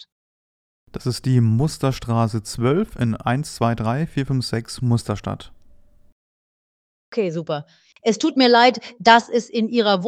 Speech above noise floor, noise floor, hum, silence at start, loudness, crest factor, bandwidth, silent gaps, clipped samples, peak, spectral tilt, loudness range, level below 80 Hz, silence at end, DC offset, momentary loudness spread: 29 dB; -49 dBFS; none; 0.95 s; -20 LUFS; 20 dB; 14 kHz; 6.12-7.12 s; under 0.1%; 0 dBFS; -6 dB/octave; 9 LU; -46 dBFS; 0 s; under 0.1%; 13 LU